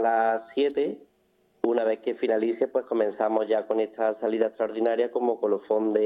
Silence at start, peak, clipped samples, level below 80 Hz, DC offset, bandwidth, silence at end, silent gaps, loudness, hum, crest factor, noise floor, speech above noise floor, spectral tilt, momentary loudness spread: 0 s; -10 dBFS; under 0.1%; -76 dBFS; under 0.1%; 4.8 kHz; 0 s; none; -26 LUFS; none; 16 dB; -66 dBFS; 41 dB; -8 dB/octave; 3 LU